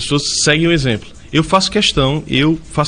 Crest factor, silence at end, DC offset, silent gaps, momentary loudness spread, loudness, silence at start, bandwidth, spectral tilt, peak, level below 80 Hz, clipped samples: 14 dB; 0 s; under 0.1%; none; 6 LU; -14 LUFS; 0 s; 10 kHz; -4 dB/octave; 0 dBFS; -34 dBFS; under 0.1%